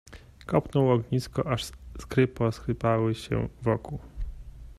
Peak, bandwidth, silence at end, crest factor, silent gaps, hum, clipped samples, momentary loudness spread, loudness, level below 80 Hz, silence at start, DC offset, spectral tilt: -8 dBFS; 13.5 kHz; 0.05 s; 20 dB; none; none; under 0.1%; 17 LU; -28 LUFS; -44 dBFS; 0.1 s; under 0.1%; -7 dB/octave